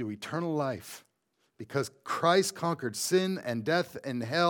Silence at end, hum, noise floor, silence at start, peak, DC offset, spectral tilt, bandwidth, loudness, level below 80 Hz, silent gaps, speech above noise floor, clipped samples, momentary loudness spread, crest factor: 0 s; none; -76 dBFS; 0 s; -10 dBFS; under 0.1%; -4.5 dB/octave; 19 kHz; -30 LUFS; -76 dBFS; none; 46 dB; under 0.1%; 12 LU; 20 dB